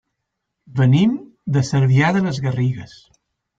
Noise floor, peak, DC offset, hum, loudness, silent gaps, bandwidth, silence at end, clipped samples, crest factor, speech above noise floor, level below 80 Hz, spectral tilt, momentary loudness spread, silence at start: -77 dBFS; -4 dBFS; under 0.1%; none; -18 LUFS; none; 7.6 kHz; 0.75 s; under 0.1%; 14 dB; 61 dB; -54 dBFS; -7 dB/octave; 12 LU; 0.7 s